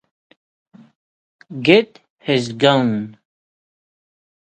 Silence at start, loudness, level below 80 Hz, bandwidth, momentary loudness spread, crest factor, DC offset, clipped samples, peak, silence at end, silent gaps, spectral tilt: 1.5 s; -17 LUFS; -64 dBFS; 9.4 kHz; 19 LU; 22 dB; under 0.1%; under 0.1%; 0 dBFS; 1.3 s; 2.10-2.17 s; -6 dB/octave